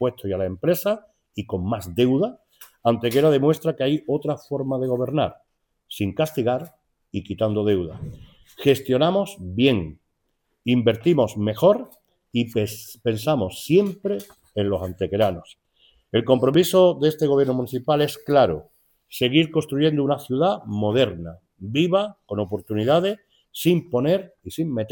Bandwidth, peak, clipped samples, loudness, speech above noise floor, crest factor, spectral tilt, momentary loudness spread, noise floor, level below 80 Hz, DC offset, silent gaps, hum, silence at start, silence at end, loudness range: 19 kHz; -2 dBFS; under 0.1%; -22 LUFS; 51 dB; 20 dB; -6.5 dB/octave; 12 LU; -73 dBFS; -56 dBFS; under 0.1%; none; none; 0 s; 0 s; 5 LU